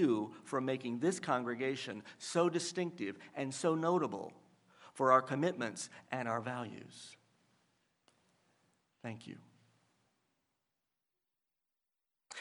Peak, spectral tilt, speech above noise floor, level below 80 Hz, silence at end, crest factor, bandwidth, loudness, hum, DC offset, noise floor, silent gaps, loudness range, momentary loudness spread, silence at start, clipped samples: -14 dBFS; -5 dB/octave; 53 dB; -88 dBFS; 0 s; 26 dB; 11.5 kHz; -36 LUFS; none; under 0.1%; -89 dBFS; none; 21 LU; 19 LU; 0 s; under 0.1%